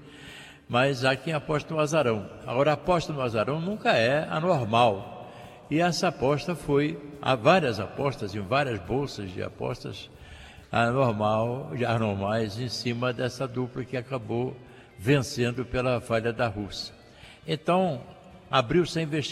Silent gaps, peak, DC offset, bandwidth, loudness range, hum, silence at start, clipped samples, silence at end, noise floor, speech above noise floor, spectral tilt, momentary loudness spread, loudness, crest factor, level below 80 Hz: none; -8 dBFS; under 0.1%; 14 kHz; 4 LU; none; 0 s; under 0.1%; 0 s; -50 dBFS; 24 dB; -6 dB/octave; 13 LU; -27 LUFS; 20 dB; -54 dBFS